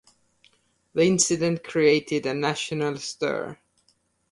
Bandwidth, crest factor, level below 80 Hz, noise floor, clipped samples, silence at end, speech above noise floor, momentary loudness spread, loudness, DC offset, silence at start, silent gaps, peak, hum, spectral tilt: 11.5 kHz; 20 dB; -64 dBFS; -68 dBFS; under 0.1%; 0.8 s; 44 dB; 9 LU; -24 LUFS; under 0.1%; 0.95 s; none; -6 dBFS; none; -4 dB/octave